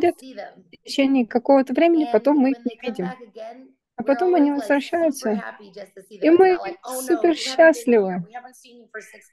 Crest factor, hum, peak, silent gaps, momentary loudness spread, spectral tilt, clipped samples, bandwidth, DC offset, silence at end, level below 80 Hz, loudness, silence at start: 18 dB; none; -4 dBFS; none; 23 LU; -5 dB/octave; under 0.1%; 12.5 kHz; under 0.1%; 0.3 s; -70 dBFS; -20 LUFS; 0 s